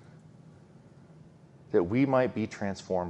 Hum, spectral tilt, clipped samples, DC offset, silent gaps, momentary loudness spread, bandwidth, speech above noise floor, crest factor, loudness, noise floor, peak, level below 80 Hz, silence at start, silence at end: none; -7.5 dB/octave; under 0.1%; under 0.1%; none; 8 LU; 8.8 kHz; 26 dB; 20 dB; -29 LUFS; -54 dBFS; -12 dBFS; -64 dBFS; 1.7 s; 0 s